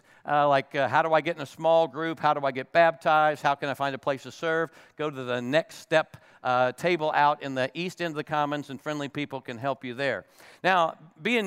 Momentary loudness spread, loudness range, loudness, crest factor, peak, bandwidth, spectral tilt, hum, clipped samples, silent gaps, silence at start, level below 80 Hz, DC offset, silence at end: 10 LU; 5 LU; -26 LUFS; 20 dB; -6 dBFS; 15 kHz; -5.5 dB/octave; none; under 0.1%; none; 0.25 s; -76 dBFS; under 0.1%; 0 s